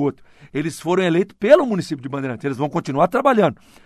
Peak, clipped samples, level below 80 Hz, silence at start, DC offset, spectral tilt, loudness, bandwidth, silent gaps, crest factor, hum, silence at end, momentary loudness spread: 0 dBFS; under 0.1%; -58 dBFS; 0 s; under 0.1%; -6.5 dB/octave; -19 LUFS; 13.5 kHz; none; 20 dB; none; 0.3 s; 12 LU